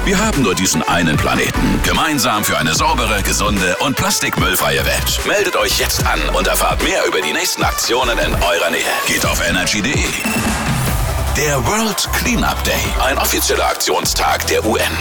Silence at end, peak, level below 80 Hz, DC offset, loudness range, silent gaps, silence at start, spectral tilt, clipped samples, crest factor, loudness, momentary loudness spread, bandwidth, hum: 0 s; -6 dBFS; -26 dBFS; under 0.1%; 1 LU; none; 0 s; -3 dB/octave; under 0.1%; 10 dB; -15 LUFS; 2 LU; over 20 kHz; none